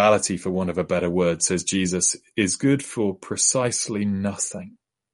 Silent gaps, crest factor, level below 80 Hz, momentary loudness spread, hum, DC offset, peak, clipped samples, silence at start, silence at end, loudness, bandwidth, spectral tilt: none; 18 dB; -56 dBFS; 7 LU; none; under 0.1%; -4 dBFS; under 0.1%; 0 s; 0.45 s; -22 LUFS; 11.5 kHz; -4 dB/octave